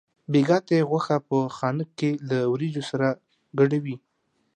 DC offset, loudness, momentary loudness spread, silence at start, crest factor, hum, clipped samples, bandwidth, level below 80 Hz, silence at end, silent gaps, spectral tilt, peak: under 0.1%; -24 LUFS; 8 LU; 0.3 s; 16 dB; none; under 0.1%; 9.8 kHz; -72 dBFS; 0.6 s; none; -7.5 dB/octave; -8 dBFS